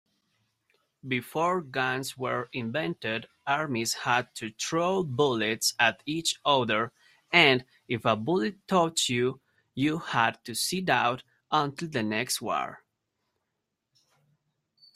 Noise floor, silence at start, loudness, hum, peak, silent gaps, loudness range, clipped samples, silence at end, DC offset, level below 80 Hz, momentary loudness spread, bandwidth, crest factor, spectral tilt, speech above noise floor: -83 dBFS; 1.05 s; -27 LUFS; none; -4 dBFS; none; 6 LU; under 0.1%; 2.2 s; under 0.1%; -68 dBFS; 8 LU; 16 kHz; 24 dB; -3.5 dB/octave; 55 dB